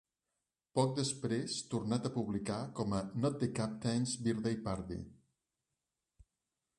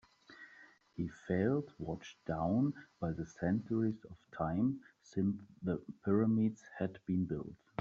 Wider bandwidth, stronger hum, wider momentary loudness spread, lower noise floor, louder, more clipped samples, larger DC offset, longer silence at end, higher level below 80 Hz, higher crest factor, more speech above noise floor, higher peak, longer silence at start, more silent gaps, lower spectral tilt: first, 11.5 kHz vs 7.4 kHz; neither; second, 6 LU vs 14 LU; first, -89 dBFS vs -62 dBFS; about the same, -37 LUFS vs -37 LUFS; neither; neither; first, 1.65 s vs 0.25 s; about the same, -62 dBFS vs -64 dBFS; about the same, 20 dB vs 16 dB; first, 53 dB vs 26 dB; about the same, -18 dBFS vs -20 dBFS; first, 0.75 s vs 0.3 s; neither; second, -5.5 dB/octave vs -8.5 dB/octave